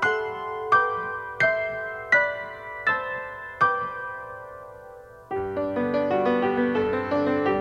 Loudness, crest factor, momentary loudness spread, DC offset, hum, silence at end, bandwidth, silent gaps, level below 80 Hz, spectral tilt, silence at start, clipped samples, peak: -25 LUFS; 18 dB; 15 LU; under 0.1%; none; 0 s; 10 kHz; none; -58 dBFS; -6 dB/octave; 0 s; under 0.1%; -8 dBFS